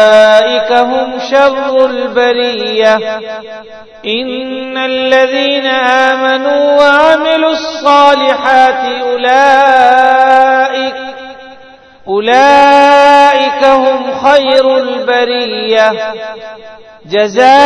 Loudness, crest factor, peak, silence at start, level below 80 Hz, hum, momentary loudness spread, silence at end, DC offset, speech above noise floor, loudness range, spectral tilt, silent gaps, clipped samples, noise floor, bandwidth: -8 LUFS; 8 dB; 0 dBFS; 0 s; -50 dBFS; none; 13 LU; 0 s; under 0.1%; 28 dB; 5 LU; -3 dB/octave; none; 3%; -36 dBFS; 11 kHz